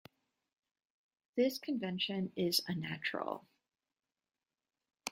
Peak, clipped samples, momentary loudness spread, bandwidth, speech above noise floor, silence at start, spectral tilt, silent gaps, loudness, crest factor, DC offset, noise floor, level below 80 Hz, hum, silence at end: -16 dBFS; under 0.1%; 10 LU; 16 kHz; over 53 dB; 1.35 s; -4 dB/octave; none; -37 LUFS; 24 dB; under 0.1%; under -90 dBFS; -80 dBFS; none; 0 s